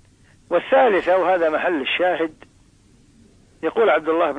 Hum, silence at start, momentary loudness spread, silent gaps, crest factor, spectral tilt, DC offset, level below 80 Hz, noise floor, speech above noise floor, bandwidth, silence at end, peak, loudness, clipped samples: none; 0.5 s; 9 LU; none; 14 dB; -5.5 dB/octave; under 0.1%; -58 dBFS; -53 dBFS; 35 dB; 9.6 kHz; 0 s; -6 dBFS; -19 LUFS; under 0.1%